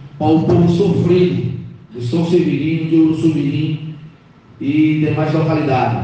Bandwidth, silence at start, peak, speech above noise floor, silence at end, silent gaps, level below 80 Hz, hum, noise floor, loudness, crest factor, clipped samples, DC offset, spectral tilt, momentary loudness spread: 8.4 kHz; 0 s; -4 dBFS; 30 dB; 0 s; none; -50 dBFS; none; -44 dBFS; -15 LUFS; 12 dB; under 0.1%; under 0.1%; -8.5 dB/octave; 13 LU